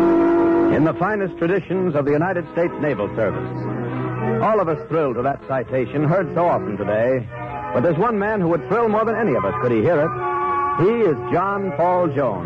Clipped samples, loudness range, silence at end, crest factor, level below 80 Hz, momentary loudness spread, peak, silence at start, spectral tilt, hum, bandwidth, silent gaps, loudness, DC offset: under 0.1%; 3 LU; 0 s; 8 dB; -50 dBFS; 6 LU; -10 dBFS; 0 s; -9.5 dB/octave; none; 6 kHz; none; -20 LUFS; under 0.1%